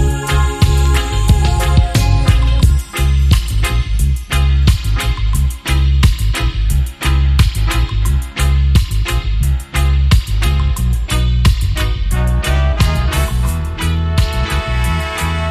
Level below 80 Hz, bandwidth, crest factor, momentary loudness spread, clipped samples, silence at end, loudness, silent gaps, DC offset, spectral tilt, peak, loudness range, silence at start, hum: -14 dBFS; 15 kHz; 12 dB; 5 LU; under 0.1%; 0 s; -15 LUFS; none; under 0.1%; -5 dB/octave; 0 dBFS; 2 LU; 0 s; none